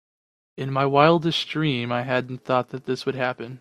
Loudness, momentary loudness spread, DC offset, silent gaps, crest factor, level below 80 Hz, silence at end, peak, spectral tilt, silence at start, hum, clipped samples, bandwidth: -23 LUFS; 10 LU; under 0.1%; none; 22 dB; -62 dBFS; 0.05 s; -2 dBFS; -6.5 dB/octave; 0.55 s; none; under 0.1%; 12.5 kHz